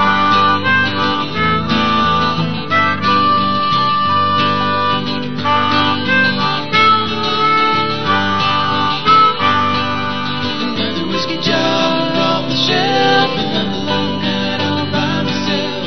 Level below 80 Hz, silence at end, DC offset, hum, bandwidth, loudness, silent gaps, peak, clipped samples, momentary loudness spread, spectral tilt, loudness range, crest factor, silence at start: -46 dBFS; 0 s; 4%; none; 6.4 kHz; -14 LUFS; none; 0 dBFS; under 0.1%; 6 LU; -5 dB/octave; 2 LU; 14 dB; 0 s